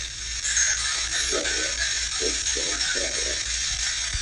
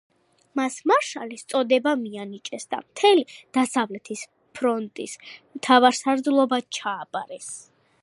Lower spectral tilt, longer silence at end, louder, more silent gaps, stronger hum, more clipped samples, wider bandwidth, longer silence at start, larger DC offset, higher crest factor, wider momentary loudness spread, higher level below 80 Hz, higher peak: second, 0 dB/octave vs -3 dB/octave; second, 0 s vs 0.4 s; about the same, -23 LUFS vs -23 LUFS; neither; neither; neither; about the same, 12 kHz vs 11.5 kHz; second, 0 s vs 0.55 s; neither; second, 16 dB vs 22 dB; second, 3 LU vs 17 LU; first, -40 dBFS vs -80 dBFS; second, -10 dBFS vs -2 dBFS